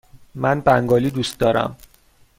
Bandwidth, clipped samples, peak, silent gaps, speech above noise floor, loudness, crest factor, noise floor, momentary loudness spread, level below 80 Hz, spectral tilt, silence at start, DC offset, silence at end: 16.5 kHz; under 0.1%; -2 dBFS; none; 36 dB; -19 LUFS; 18 dB; -54 dBFS; 7 LU; -46 dBFS; -6 dB/octave; 0.35 s; under 0.1%; 0.65 s